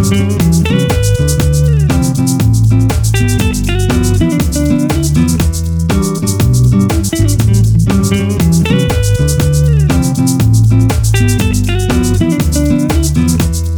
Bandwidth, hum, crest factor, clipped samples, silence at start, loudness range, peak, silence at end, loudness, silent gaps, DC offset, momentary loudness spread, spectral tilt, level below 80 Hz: over 20 kHz; none; 10 dB; under 0.1%; 0 s; 1 LU; 0 dBFS; 0 s; -11 LUFS; none; under 0.1%; 3 LU; -6 dB/octave; -18 dBFS